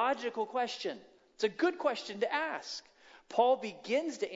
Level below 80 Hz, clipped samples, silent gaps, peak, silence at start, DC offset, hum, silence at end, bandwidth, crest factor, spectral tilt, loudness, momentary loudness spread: -82 dBFS; under 0.1%; none; -14 dBFS; 0 s; under 0.1%; none; 0 s; 7.8 kHz; 20 dB; -3.5 dB/octave; -34 LUFS; 11 LU